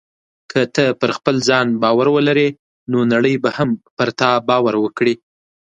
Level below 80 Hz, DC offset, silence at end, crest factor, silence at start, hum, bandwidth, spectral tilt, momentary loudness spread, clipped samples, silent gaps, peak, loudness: -60 dBFS; under 0.1%; 0.45 s; 16 dB; 0.5 s; none; 9 kHz; -5.5 dB/octave; 7 LU; under 0.1%; 2.59-2.87 s, 3.91-3.97 s; 0 dBFS; -16 LUFS